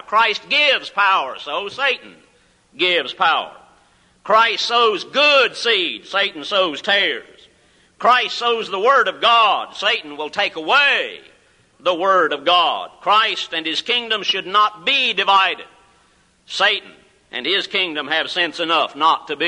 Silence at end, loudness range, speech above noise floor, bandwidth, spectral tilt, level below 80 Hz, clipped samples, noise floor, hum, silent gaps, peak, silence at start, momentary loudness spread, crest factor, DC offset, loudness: 0 s; 3 LU; 39 dB; 11 kHz; -2 dB/octave; -66 dBFS; under 0.1%; -57 dBFS; none; none; -2 dBFS; 0.1 s; 8 LU; 16 dB; under 0.1%; -17 LUFS